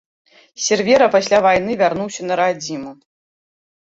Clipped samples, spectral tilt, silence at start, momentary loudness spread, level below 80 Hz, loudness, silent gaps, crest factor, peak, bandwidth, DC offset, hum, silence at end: under 0.1%; -3.5 dB/octave; 0.6 s; 13 LU; -56 dBFS; -16 LUFS; none; 16 dB; -2 dBFS; 8 kHz; under 0.1%; none; 1 s